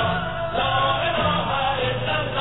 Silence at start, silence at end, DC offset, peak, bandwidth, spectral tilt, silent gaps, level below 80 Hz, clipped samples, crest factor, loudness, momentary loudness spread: 0 s; 0 s; 0.9%; -10 dBFS; 4.1 kHz; -8.5 dB/octave; none; -42 dBFS; under 0.1%; 14 dB; -22 LUFS; 3 LU